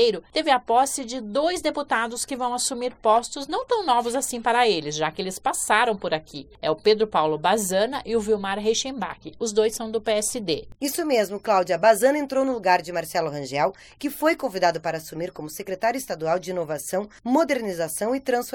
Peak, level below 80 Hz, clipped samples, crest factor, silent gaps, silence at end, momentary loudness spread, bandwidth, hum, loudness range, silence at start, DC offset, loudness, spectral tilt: -4 dBFS; -56 dBFS; under 0.1%; 20 dB; none; 0.05 s; 9 LU; 17.5 kHz; none; 4 LU; 0 s; under 0.1%; -24 LUFS; -3 dB/octave